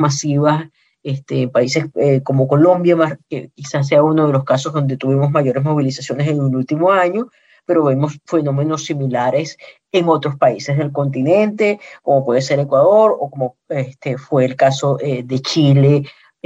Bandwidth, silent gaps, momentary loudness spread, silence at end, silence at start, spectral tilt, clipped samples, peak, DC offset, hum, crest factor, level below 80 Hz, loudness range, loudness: 8 kHz; none; 11 LU; 0.35 s; 0 s; -6.5 dB/octave; under 0.1%; -2 dBFS; under 0.1%; none; 14 dB; -64 dBFS; 2 LU; -16 LUFS